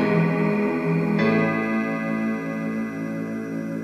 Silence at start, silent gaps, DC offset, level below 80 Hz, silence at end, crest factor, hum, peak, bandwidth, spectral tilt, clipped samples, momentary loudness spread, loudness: 0 s; none; under 0.1%; -60 dBFS; 0 s; 14 dB; none; -8 dBFS; 13 kHz; -8 dB/octave; under 0.1%; 9 LU; -24 LUFS